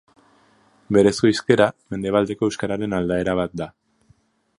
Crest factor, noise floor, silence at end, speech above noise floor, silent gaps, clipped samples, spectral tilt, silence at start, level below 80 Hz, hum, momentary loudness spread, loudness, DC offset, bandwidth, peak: 20 dB; -60 dBFS; 0.9 s; 40 dB; none; under 0.1%; -6 dB/octave; 0.9 s; -50 dBFS; none; 11 LU; -20 LUFS; under 0.1%; 11 kHz; 0 dBFS